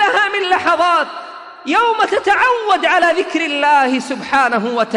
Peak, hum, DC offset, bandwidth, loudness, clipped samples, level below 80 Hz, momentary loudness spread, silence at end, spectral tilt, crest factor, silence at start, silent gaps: -2 dBFS; none; under 0.1%; 11 kHz; -14 LUFS; under 0.1%; -58 dBFS; 6 LU; 0 s; -3 dB/octave; 14 dB; 0 s; none